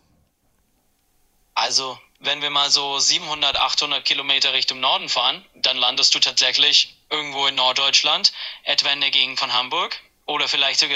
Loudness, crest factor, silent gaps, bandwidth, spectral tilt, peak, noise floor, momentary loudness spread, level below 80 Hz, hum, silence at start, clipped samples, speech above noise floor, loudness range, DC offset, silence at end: -18 LUFS; 20 dB; none; 15.5 kHz; 1 dB/octave; 0 dBFS; -65 dBFS; 9 LU; -62 dBFS; none; 1.55 s; under 0.1%; 45 dB; 3 LU; under 0.1%; 0 s